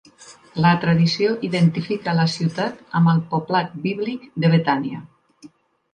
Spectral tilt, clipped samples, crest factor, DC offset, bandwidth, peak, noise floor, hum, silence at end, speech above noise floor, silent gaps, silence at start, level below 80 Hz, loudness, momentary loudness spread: -7 dB/octave; under 0.1%; 18 dB; under 0.1%; 9.4 kHz; -2 dBFS; -48 dBFS; none; 0.45 s; 29 dB; none; 0.2 s; -60 dBFS; -20 LUFS; 9 LU